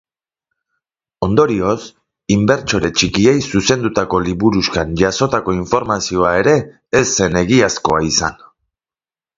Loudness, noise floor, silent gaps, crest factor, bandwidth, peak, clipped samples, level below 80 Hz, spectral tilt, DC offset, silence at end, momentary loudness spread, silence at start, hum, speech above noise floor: -15 LUFS; under -90 dBFS; none; 16 dB; 7.8 kHz; 0 dBFS; under 0.1%; -38 dBFS; -4.5 dB/octave; under 0.1%; 1.05 s; 5 LU; 1.2 s; none; over 75 dB